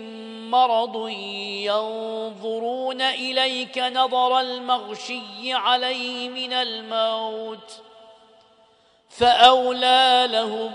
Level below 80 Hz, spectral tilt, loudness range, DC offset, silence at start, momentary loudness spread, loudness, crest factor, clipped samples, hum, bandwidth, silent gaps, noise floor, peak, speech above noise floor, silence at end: -64 dBFS; -2.5 dB/octave; 6 LU; under 0.1%; 0 s; 15 LU; -21 LUFS; 22 dB; under 0.1%; none; 10.5 kHz; none; -58 dBFS; 0 dBFS; 36 dB; 0 s